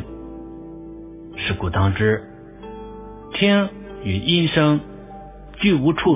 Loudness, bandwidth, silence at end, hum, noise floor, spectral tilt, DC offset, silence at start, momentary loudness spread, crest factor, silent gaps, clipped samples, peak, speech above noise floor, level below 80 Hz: -20 LUFS; 3.9 kHz; 0 s; none; -38 dBFS; -10.5 dB/octave; under 0.1%; 0 s; 21 LU; 20 dB; none; under 0.1%; -2 dBFS; 20 dB; -38 dBFS